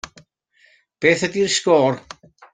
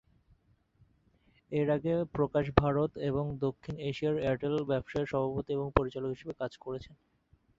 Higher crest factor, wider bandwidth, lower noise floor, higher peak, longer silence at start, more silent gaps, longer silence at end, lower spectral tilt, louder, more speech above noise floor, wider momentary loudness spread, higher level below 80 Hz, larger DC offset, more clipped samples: second, 18 dB vs 30 dB; first, 9.6 kHz vs 7.6 kHz; second, -58 dBFS vs -68 dBFS; about the same, -2 dBFS vs -4 dBFS; second, 1 s vs 1.5 s; neither; about the same, 0.55 s vs 0.65 s; second, -3.5 dB/octave vs -8.5 dB/octave; first, -18 LUFS vs -32 LUFS; first, 41 dB vs 36 dB; about the same, 12 LU vs 10 LU; second, -60 dBFS vs -50 dBFS; neither; neither